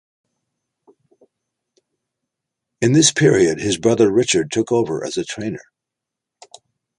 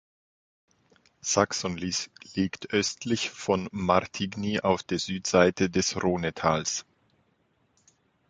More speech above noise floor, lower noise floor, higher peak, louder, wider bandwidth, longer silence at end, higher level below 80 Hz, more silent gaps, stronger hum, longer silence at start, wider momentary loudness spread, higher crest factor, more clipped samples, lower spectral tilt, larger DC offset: first, 67 dB vs 43 dB; first, -84 dBFS vs -70 dBFS; about the same, -2 dBFS vs -4 dBFS; first, -17 LUFS vs -27 LUFS; first, 11 kHz vs 9.6 kHz; about the same, 1.4 s vs 1.5 s; about the same, -54 dBFS vs -54 dBFS; neither; neither; first, 2.8 s vs 1.25 s; first, 13 LU vs 8 LU; second, 18 dB vs 24 dB; neither; about the same, -4.5 dB/octave vs -4 dB/octave; neither